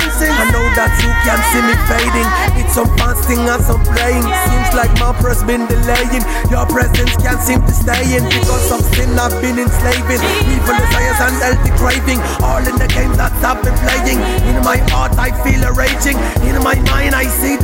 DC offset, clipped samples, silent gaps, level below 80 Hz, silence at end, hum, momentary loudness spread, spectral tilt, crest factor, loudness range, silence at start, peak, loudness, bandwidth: under 0.1%; under 0.1%; none; -16 dBFS; 0 s; none; 3 LU; -4.5 dB/octave; 12 dB; 1 LU; 0 s; 0 dBFS; -13 LUFS; 16.5 kHz